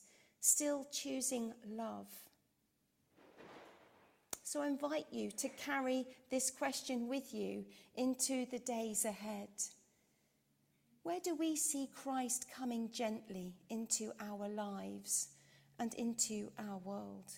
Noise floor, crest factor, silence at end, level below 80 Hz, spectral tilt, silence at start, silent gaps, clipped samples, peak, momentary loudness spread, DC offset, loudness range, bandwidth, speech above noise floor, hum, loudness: -81 dBFS; 24 dB; 0 s; -84 dBFS; -2.5 dB/octave; 0 s; none; under 0.1%; -18 dBFS; 11 LU; under 0.1%; 6 LU; 16.5 kHz; 40 dB; none; -40 LUFS